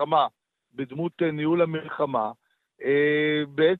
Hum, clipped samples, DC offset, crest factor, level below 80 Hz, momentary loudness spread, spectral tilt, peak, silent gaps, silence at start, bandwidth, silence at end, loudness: none; under 0.1%; under 0.1%; 18 dB; -70 dBFS; 11 LU; -9 dB/octave; -8 dBFS; none; 0 s; 4.4 kHz; 0 s; -25 LUFS